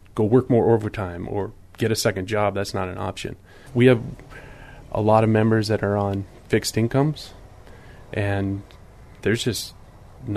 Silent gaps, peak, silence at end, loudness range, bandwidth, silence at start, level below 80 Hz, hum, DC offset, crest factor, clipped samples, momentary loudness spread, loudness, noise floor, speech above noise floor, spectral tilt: none; -4 dBFS; 0 s; 5 LU; 13.5 kHz; 0.15 s; -48 dBFS; none; under 0.1%; 20 dB; under 0.1%; 17 LU; -22 LUFS; -44 dBFS; 22 dB; -6 dB/octave